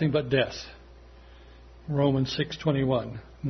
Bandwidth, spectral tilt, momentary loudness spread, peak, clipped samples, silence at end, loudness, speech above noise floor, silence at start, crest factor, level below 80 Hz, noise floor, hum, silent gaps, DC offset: 6.4 kHz; -7 dB/octave; 15 LU; -8 dBFS; under 0.1%; 0 s; -27 LUFS; 23 dB; 0 s; 20 dB; -50 dBFS; -50 dBFS; none; none; under 0.1%